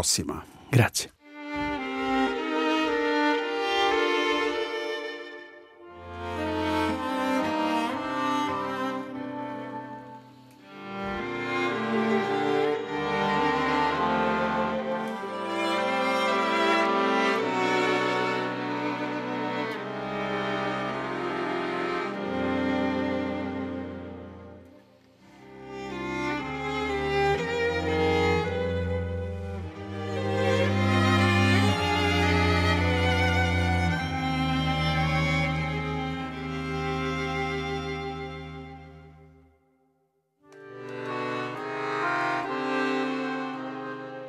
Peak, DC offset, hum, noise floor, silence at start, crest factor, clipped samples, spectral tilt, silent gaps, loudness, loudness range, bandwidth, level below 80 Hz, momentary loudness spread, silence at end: -6 dBFS; under 0.1%; none; -72 dBFS; 0 s; 20 dB; under 0.1%; -5 dB/octave; none; -27 LUFS; 9 LU; 15.5 kHz; -52 dBFS; 13 LU; 0 s